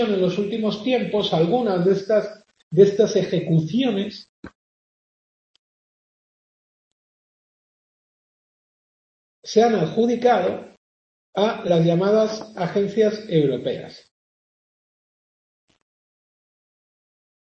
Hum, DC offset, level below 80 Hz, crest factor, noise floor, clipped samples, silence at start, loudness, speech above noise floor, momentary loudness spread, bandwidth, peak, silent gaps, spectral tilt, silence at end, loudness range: none; under 0.1%; -66 dBFS; 20 dB; under -90 dBFS; under 0.1%; 0 s; -20 LUFS; over 70 dB; 11 LU; 7.2 kHz; -2 dBFS; 2.63-2.71 s, 4.29-4.43 s, 4.55-9.43 s, 10.77-11.33 s; -6.5 dB/octave; 3.55 s; 9 LU